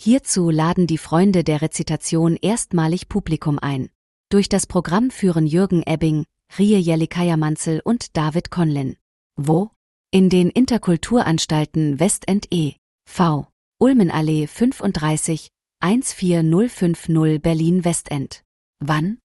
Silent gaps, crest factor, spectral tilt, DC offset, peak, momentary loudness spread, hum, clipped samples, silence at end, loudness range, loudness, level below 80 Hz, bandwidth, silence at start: 3.95-4.24 s, 9.01-9.30 s, 9.76-10.05 s, 12.78-12.99 s, 13.52-13.72 s, 18.45-18.74 s; 14 dB; -6 dB/octave; under 0.1%; -4 dBFS; 8 LU; none; under 0.1%; 0.25 s; 2 LU; -19 LUFS; -46 dBFS; 12 kHz; 0 s